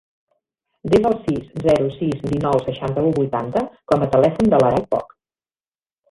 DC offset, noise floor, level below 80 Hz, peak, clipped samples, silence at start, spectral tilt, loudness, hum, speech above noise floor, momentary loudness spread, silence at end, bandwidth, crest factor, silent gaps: under 0.1%; under -90 dBFS; -46 dBFS; -2 dBFS; under 0.1%; 0.85 s; -8 dB/octave; -19 LUFS; none; over 72 dB; 9 LU; 1.05 s; 11.5 kHz; 18 dB; none